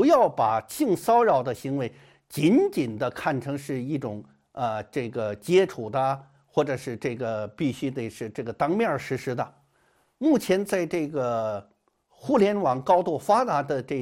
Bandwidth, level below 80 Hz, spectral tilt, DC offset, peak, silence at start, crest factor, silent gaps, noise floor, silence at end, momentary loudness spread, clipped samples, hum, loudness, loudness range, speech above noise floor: 16.5 kHz; -64 dBFS; -6.5 dB/octave; under 0.1%; -8 dBFS; 0 s; 18 dB; none; -66 dBFS; 0 s; 12 LU; under 0.1%; none; -26 LUFS; 4 LU; 41 dB